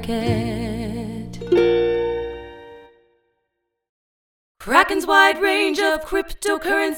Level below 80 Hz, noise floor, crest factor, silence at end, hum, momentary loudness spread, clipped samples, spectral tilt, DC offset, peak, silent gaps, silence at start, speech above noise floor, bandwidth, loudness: -42 dBFS; -77 dBFS; 22 dB; 0 s; none; 17 LU; under 0.1%; -4.5 dB/octave; under 0.1%; 0 dBFS; 3.89-4.55 s; 0 s; 58 dB; over 20 kHz; -19 LUFS